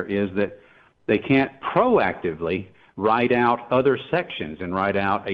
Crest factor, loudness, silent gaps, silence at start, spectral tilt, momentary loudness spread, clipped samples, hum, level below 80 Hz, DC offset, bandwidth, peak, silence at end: 16 dB; -22 LUFS; none; 0 s; -9 dB/octave; 10 LU; under 0.1%; none; -54 dBFS; under 0.1%; 5.2 kHz; -6 dBFS; 0 s